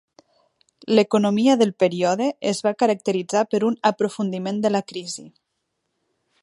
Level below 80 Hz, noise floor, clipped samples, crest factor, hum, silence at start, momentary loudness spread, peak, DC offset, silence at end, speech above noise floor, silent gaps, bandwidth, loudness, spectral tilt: -72 dBFS; -76 dBFS; under 0.1%; 20 dB; none; 0.85 s; 10 LU; -2 dBFS; under 0.1%; 1.15 s; 56 dB; none; 11.5 kHz; -21 LUFS; -5 dB/octave